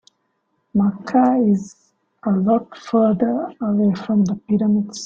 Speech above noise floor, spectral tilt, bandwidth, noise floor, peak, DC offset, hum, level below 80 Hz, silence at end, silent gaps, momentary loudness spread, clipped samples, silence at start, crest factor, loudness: 51 dB; -7.5 dB/octave; 7.6 kHz; -69 dBFS; -4 dBFS; under 0.1%; none; -58 dBFS; 0 s; none; 6 LU; under 0.1%; 0.75 s; 14 dB; -19 LUFS